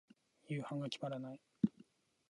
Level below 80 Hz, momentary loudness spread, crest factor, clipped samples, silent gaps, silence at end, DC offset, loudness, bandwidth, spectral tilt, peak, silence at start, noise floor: -80 dBFS; 7 LU; 24 dB; under 0.1%; none; 0.6 s; under 0.1%; -43 LUFS; 11 kHz; -7 dB/octave; -18 dBFS; 0.5 s; -68 dBFS